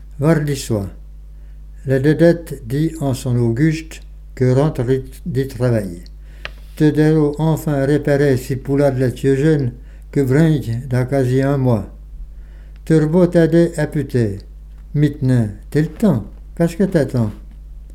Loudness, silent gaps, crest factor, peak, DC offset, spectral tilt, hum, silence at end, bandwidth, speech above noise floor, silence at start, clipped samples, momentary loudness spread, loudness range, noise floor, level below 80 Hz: -17 LUFS; none; 16 dB; 0 dBFS; under 0.1%; -8 dB/octave; none; 0 s; 15.5 kHz; 20 dB; 0 s; under 0.1%; 17 LU; 3 LU; -35 dBFS; -34 dBFS